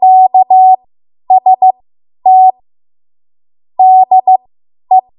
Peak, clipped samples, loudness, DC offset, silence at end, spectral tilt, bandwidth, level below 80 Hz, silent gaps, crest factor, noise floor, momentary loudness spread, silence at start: 0 dBFS; under 0.1%; -8 LUFS; under 0.1%; 0.2 s; -9.5 dB/octave; 1 kHz; -68 dBFS; none; 8 dB; under -90 dBFS; 8 LU; 0 s